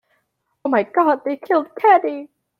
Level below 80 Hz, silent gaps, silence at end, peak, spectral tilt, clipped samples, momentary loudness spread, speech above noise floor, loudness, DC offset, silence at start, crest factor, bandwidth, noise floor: -74 dBFS; none; 0.35 s; -2 dBFS; -7 dB/octave; under 0.1%; 13 LU; 53 dB; -18 LUFS; under 0.1%; 0.65 s; 16 dB; 14.5 kHz; -70 dBFS